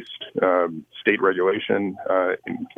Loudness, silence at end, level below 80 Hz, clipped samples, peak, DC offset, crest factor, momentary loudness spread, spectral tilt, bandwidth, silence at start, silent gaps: -22 LUFS; 0.1 s; -72 dBFS; under 0.1%; -4 dBFS; under 0.1%; 20 dB; 7 LU; -7.5 dB/octave; 4.1 kHz; 0 s; none